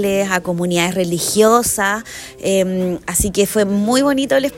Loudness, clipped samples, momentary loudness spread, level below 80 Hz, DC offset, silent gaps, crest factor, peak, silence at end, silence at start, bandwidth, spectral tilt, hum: -16 LUFS; under 0.1%; 6 LU; -40 dBFS; under 0.1%; none; 16 dB; 0 dBFS; 0 s; 0 s; 16.5 kHz; -4 dB/octave; none